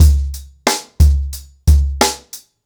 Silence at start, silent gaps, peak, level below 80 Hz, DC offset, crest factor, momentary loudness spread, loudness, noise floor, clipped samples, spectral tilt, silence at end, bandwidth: 0 s; none; -2 dBFS; -16 dBFS; under 0.1%; 12 dB; 14 LU; -16 LUFS; -38 dBFS; under 0.1%; -4.5 dB/octave; 0.25 s; 19.5 kHz